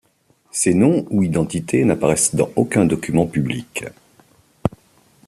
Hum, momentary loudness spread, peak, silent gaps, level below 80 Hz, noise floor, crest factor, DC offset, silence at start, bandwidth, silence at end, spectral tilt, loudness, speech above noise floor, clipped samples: none; 10 LU; -2 dBFS; none; -50 dBFS; -60 dBFS; 16 dB; under 0.1%; 0.55 s; 14.5 kHz; 0.6 s; -5.5 dB/octave; -18 LUFS; 42 dB; under 0.1%